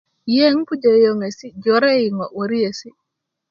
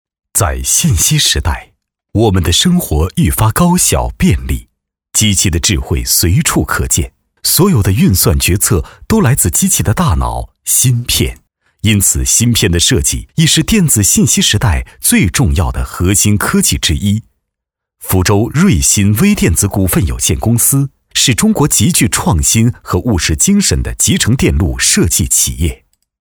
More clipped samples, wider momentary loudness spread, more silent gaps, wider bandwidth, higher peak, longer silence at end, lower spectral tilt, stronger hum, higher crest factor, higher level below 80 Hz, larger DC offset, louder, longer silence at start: neither; first, 10 LU vs 7 LU; neither; second, 7.2 kHz vs over 20 kHz; about the same, -2 dBFS vs 0 dBFS; first, 0.6 s vs 0.45 s; first, -5.5 dB/octave vs -3.5 dB/octave; neither; about the same, 16 dB vs 12 dB; second, -66 dBFS vs -24 dBFS; neither; second, -17 LUFS vs -11 LUFS; about the same, 0.25 s vs 0.35 s